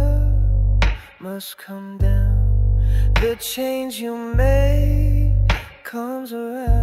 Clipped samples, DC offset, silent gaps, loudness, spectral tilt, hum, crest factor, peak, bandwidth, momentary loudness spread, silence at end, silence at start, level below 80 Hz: under 0.1%; under 0.1%; none; -20 LUFS; -6.5 dB/octave; none; 14 dB; -4 dBFS; 15 kHz; 13 LU; 0 s; 0 s; -20 dBFS